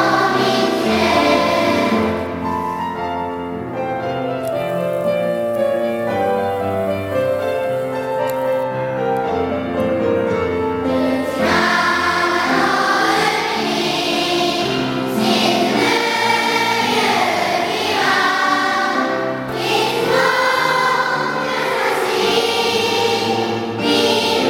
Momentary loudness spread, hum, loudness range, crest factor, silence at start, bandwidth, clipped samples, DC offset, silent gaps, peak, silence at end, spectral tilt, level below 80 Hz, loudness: 7 LU; none; 4 LU; 16 dB; 0 s; 17 kHz; under 0.1%; under 0.1%; none; -2 dBFS; 0 s; -4 dB/octave; -50 dBFS; -17 LUFS